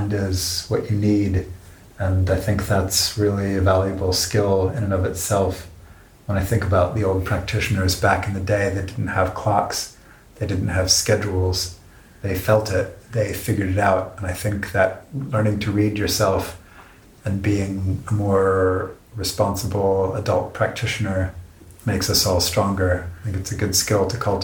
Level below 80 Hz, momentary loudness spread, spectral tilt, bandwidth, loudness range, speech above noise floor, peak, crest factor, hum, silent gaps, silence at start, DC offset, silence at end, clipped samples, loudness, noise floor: -40 dBFS; 9 LU; -4.5 dB/octave; 19.5 kHz; 2 LU; 26 dB; -2 dBFS; 20 dB; none; none; 0 s; under 0.1%; 0 s; under 0.1%; -21 LUFS; -46 dBFS